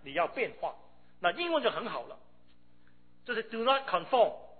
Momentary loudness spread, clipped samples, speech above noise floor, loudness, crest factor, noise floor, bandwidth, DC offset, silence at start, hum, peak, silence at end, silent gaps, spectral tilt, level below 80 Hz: 12 LU; under 0.1%; 35 dB; -31 LUFS; 20 dB; -66 dBFS; 4.6 kHz; 0.2%; 0.05 s; 60 Hz at -70 dBFS; -14 dBFS; 0.15 s; none; -7 dB/octave; -70 dBFS